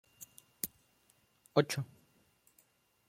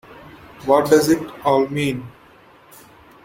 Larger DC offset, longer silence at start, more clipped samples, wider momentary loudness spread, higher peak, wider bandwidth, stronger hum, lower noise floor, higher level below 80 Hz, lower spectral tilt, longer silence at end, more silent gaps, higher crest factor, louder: neither; about the same, 0.2 s vs 0.1 s; neither; first, 21 LU vs 12 LU; second, -12 dBFS vs -2 dBFS; about the same, 16.5 kHz vs 16.5 kHz; neither; first, -72 dBFS vs -49 dBFS; second, -78 dBFS vs -54 dBFS; about the same, -5 dB/octave vs -5.5 dB/octave; about the same, 1.25 s vs 1.15 s; neither; first, 28 dB vs 18 dB; second, -36 LUFS vs -18 LUFS